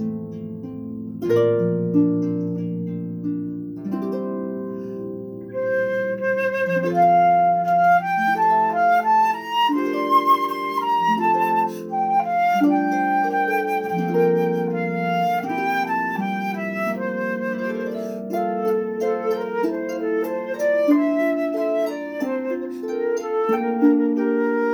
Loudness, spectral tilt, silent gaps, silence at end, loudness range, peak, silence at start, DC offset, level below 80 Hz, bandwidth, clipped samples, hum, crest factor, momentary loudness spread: -21 LUFS; -7 dB/octave; none; 0 s; 6 LU; -6 dBFS; 0 s; under 0.1%; -68 dBFS; over 20 kHz; under 0.1%; none; 16 dB; 11 LU